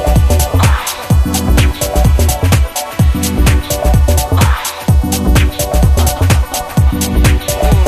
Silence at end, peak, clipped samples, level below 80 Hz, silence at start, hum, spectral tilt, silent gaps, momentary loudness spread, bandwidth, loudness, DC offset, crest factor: 0 s; 0 dBFS; under 0.1%; -14 dBFS; 0 s; none; -5 dB/octave; none; 3 LU; 15 kHz; -12 LUFS; under 0.1%; 10 dB